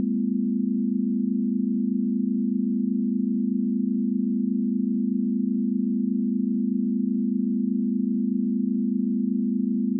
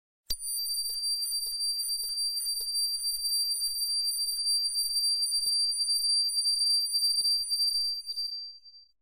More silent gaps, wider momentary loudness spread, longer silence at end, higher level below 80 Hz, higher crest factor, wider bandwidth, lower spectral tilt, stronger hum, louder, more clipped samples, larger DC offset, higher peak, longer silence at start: neither; second, 0 LU vs 7 LU; second, 0 s vs 0.2 s; second, under -90 dBFS vs -60 dBFS; second, 8 dB vs 14 dB; second, 0.4 kHz vs 16 kHz; first, -17 dB/octave vs 4 dB/octave; neither; about the same, -25 LUFS vs -26 LUFS; neither; neither; about the same, -16 dBFS vs -16 dBFS; second, 0 s vs 0.3 s